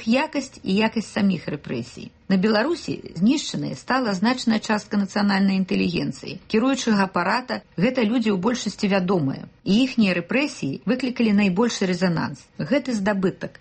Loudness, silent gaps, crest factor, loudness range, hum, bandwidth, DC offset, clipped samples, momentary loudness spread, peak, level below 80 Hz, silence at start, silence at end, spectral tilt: -22 LUFS; none; 14 dB; 2 LU; none; 8.8 kHz; under 0.1%; under 0.1%; 9 LU; -8 dBFS; -56 dBFS; 0 s; 0.1 s; -5.5 dB/octave